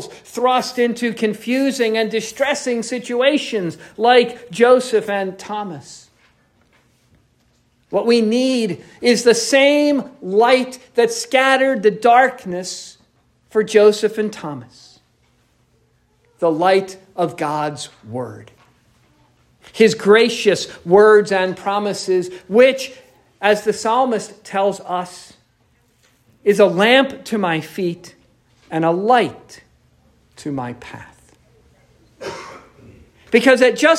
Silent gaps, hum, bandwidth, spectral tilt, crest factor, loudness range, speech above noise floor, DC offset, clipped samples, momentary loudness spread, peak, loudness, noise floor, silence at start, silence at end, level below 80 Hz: none; none; 15 kHz; -4 dB/octave; 18 dB; 7 LU; 43 dB; under 0.1%; under 0.1%; 17 LU; 0 dBFS; -16 LUFS; -59 dBFS; 0 s; 0 s; -62 dBFS